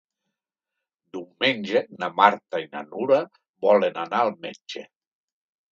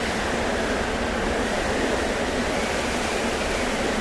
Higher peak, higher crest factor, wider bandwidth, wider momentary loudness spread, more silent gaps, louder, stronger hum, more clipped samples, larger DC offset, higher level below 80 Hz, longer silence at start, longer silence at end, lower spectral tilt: first, 0 dBFS vs -10 dBFS; first, 24 dB vs 14 dB; second, 7.4 kHz vs 11 kHz; first, 19 LU vs 1 LU; first, 3.49-3.54 s vs none; about the same, -23 LUFS vs -24 LUFS; neither; neither; neither; second, -80 dBFS vs -36 dBFS; first, 1.15 s vs 0 s; first, 0.9 s vs 0 s; first, -5 dB/octave vs -3.5 dB/octave